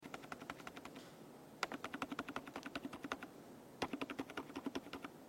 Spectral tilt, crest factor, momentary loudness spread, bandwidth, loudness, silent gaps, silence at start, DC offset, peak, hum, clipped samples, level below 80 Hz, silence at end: -4 dB/octave; 28 dB; 11 LU; 16.5 kHz; -48 LUFS; none; 0 s; under 0.1%; -22 dBFS; none; under 0.1%; -76 dBFS; 0 s